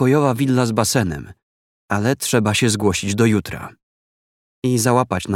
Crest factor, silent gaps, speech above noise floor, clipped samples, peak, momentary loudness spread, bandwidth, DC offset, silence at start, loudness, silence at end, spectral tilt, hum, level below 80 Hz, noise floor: 18 dB; 1.43-1.89 s, 3.83-4.62 s; over 72 dB; under 0.1%; -2 dBFS; 10 LU; 16.5 kHz; under 0.1%; 0 s; -18 LUFS; 0 s; -5 dB/octave; none; -48 dBFS; under -90 dBFS